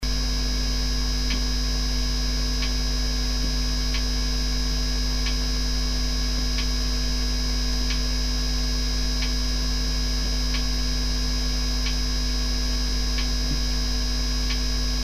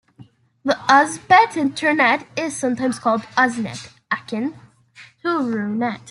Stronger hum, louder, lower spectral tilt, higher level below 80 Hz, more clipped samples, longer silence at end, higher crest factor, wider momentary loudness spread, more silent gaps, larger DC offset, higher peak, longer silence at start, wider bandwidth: neither; second, -25 LUFS vs -19 LUFS; about the same, -3.5 dB/octave vs -4 dB/octave; first, -24 dBFS vs -66 dBFS; neither; about the same, 0 s vs 0 s; second, 10 dB vs 18 dB; second, 0 LU vs 13 LU; neither; neither; second, -12 dBFS vs -2 dBFS; second, 0 s vs 0.2 s; first, 15 kHz vs 12 kHz